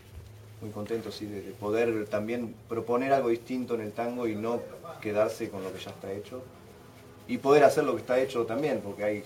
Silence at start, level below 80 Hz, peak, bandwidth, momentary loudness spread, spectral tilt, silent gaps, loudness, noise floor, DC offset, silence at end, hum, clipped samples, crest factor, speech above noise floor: 0.05 s; -62 dBFS; -6 dBFS; 16.5 kHz; 18 LU; -6 dB/octave; none; -29 LUFS; -50 dBFS; under 0.1%; 0 s; none; under 0.1%; 24 dB; 21 dB